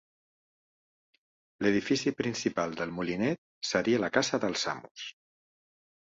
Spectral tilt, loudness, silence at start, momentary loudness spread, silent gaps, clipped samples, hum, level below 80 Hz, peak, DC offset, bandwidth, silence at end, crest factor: -4 dB/octave; -30 LUFS; 1.6 s; 9 LU; 3.38-3.61 s, 4.91-4.95 s; under 0.1%; none; -66 dBFS; -10 dBFS; under 0.1%; 8 kHz; 0.9 s; 22 dB